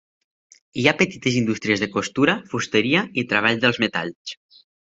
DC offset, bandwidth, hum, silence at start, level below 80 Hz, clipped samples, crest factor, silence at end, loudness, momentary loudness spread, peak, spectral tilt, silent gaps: under 0.1%; 8 kHz; none; 0.75 s; -60 dBFS; under 0.1%; 22 dB; 0.55 s; -20 LUFS; 13 LU; 0 dBFS; -4.5 dB/octave; 4.15-4.25 s